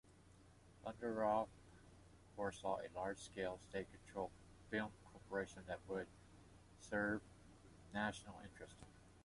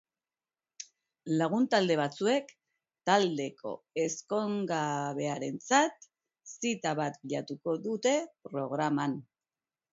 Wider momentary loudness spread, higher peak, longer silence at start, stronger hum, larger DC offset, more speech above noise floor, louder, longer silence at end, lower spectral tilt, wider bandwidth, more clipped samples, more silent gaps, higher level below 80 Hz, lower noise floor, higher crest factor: first, 23 LU vs 13 LU; second, -28 dBFS vs -10 dBFS; second, 0.05 s vs 0.8 s; neither; neither; second, 21 dB vs over 59 dB; second, -46 LUFS vs -31 LUFS; second, 0 s vs 0.7 s; about the same, -5 dB/octave vs -4.5 dB/octave; first, 11.5 kHz vs 8 kHz; neither; neither; first, -68 dBFS vs -80 dBFS; second, -67 dBFS vs under -90 dBFS; about the same, 20 dB vs 22 dB